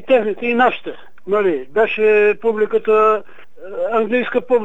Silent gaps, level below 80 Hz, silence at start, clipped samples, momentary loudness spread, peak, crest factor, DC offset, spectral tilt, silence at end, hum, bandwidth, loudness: none; -64 dBFS; 0.1 s; under 0.1%; 11 LU; -2 dBFS; 14 dB; 2%; -6.5 dB/octave; 0 s; none; 4 kHz; -16 LUFS